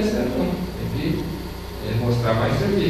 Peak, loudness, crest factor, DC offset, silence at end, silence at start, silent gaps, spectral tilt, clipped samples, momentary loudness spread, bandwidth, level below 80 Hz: -6 dBFS; -24 LUFS; 16 dB; under 0.1%; 0 s; 0 s; none; -7 dB/octave; under 0.1%; 10 LU; 14 kHz; -36 dBFS